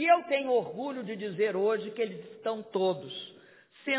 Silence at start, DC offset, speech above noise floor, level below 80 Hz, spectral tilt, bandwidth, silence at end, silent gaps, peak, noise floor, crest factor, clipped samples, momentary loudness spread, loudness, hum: 0 s; under 0.1%; 27 dB; -86 dBFS; -8.5 dB/octave; 4 kHz; 0 s; none; -12 dBFS; -57 dBFS; 18 dB; under 0.1%; 13 LU; -31 LUFS; none